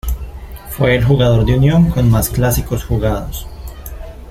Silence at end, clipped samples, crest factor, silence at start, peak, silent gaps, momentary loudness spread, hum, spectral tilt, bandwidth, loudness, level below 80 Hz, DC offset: 0 s; under 0.1%; 12 dB; 0.05 s; -2 dBFS; none; 19 LU; none; -6.5 dB/octave; 16.5 kHz; -14 LUFS; -24 dBFS; under 0.1%